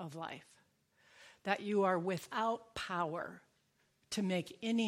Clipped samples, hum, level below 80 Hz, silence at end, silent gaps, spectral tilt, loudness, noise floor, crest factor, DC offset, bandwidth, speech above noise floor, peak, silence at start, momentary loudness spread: under 0.1%; none; -74 dBFS; 0 s; none; -5 dB/octave; -38 LUFS; -76 dBFS; 22 dB; under 0.1%; 16 kHz; 39 dB; -18 dBFS; 0 s; 13 LU